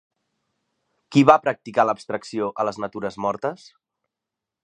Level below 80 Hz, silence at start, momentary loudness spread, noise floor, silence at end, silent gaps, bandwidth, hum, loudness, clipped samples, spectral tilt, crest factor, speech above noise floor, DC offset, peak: -64 dBFS; 1.1 s; 14 LU; -86 dBFS; 1.1 s; none; 9.8 kHz; none; -22 LUFS; under 0.1%; -6.5 dB/octave; 24 dB; 65 dB; under 0.1%; 0 dBFS